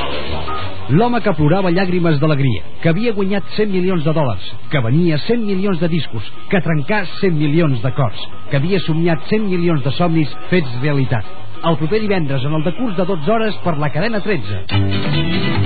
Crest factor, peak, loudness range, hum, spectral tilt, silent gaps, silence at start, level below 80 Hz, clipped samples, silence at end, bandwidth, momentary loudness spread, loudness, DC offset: 14 dB; -2 dBFS; 2 LU; none; -6 dB/octave; none; 0 s; -42 dBFS; under 0.1%; 0 s; 4.8 kHz; 6 LU; -17 LUFS; 10%